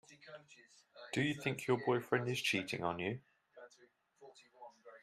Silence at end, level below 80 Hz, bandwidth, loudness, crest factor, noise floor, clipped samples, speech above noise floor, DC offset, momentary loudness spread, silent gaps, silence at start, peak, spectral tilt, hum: 0.05 s; -78 dBFS; 14.5 kHz; -37 LUFS; 24 dB; -69 dBFS; under 0.1%; 32 dB; under 0.1%; 23 LU; none; 0.1 s; -18 dBFS; -5 dB/octave; none